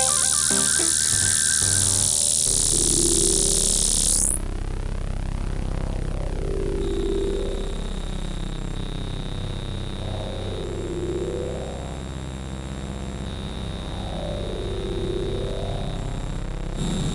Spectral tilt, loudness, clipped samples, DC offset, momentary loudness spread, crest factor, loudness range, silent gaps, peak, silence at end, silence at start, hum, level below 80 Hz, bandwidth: -2.5 dB/octave; -22 LUFS; under 0.1%; under 0.1%; 15 LU; 18 dB; 14 LU; none; -6 dBFS; 0 s; 0 s; none; -30 dBFS; 11.5 kHz